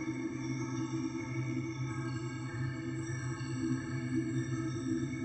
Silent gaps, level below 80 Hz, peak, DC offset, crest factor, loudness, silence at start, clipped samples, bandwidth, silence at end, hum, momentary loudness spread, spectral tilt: none; -62 dBFS; -22 dBFS; under 0.1%; 14 dB; -37 LUFS; 0 s; under 0.1%; 8.6 kHz; 0 s; none; 3 LU; -6.5 dB/octave